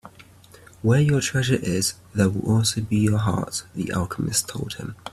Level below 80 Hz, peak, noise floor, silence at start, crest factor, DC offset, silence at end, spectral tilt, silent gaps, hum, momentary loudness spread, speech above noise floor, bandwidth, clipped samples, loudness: -50 dBFS; -6 dBFS; -49 dBFS; 0.05 s; 18 dB; under 0.1%; 0.05 s; -5 dB/octave; none; none; 9 LU; 26 dB; 14 kHz; under 0.1%; -23 LUFS